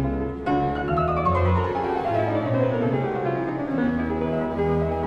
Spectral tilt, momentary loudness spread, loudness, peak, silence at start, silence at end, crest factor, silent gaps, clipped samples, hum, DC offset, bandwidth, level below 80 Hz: -9.5 dB/octave; 4 LU; -24 LUFS; -10 dBFS; 0 s; 0 s; 12 dB; none; under 0.1%; none; under 0.1%; 7 kHz; -38 dBFS